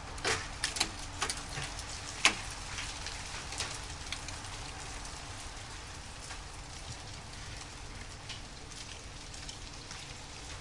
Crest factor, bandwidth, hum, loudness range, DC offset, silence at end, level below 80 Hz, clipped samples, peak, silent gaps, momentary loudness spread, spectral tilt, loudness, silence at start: 34 dB; 11.5 kHz; none; 10 LU; 0.1%; 0 s; -50 dBFS; under 0.1%; -6 dBFS; none; 12 LU; -1.5 dB/octave; -38 LUFS; 0 s